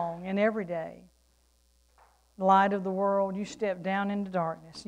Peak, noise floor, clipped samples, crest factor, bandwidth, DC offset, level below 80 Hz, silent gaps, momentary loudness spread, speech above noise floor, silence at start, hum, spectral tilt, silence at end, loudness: -10 dBFS; -67 dBFS; under 0.1%; 20 dB; 10 kHz; under 0.1%; -66 dBFS; none; 11 LU; 38 dB; 0 s; none; -6.5 dB/octave; 0.05 s; -29 LUFS